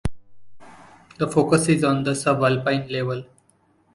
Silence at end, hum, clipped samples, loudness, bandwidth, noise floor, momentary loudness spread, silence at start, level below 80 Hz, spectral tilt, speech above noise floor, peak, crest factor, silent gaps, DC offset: 0.7 s; none; under 0.1%; -21 LUFS; 11.5 kHz; -61 dBFS; 10 LU; 0.05 s; -44 dBFS; -5.5 dB/octave; 41 dB; -4 dBFS; 20 dB; none; under 0.1%